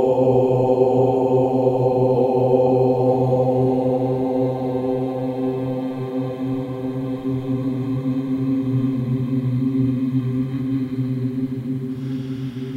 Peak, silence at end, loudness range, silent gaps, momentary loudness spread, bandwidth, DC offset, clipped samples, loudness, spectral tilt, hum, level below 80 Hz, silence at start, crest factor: -4 dBFS; 0 s; 7 LU; none; 9 LU; 7.2 kHz; under 0.1%; under 0.1%; -21 LUFS; -10 dB/octave; none; -52 dBFS; 0 s; 16 dB